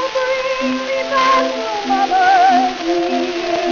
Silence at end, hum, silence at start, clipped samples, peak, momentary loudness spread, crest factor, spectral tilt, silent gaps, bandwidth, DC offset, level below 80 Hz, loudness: 0 s; none; 0 s; under 0.1%; -2 dBFS; 8 LU; 14 dB; 0 dB/octave; none; 7.2 kHz; under 0.1%; -50 dBFS; -16 LUFS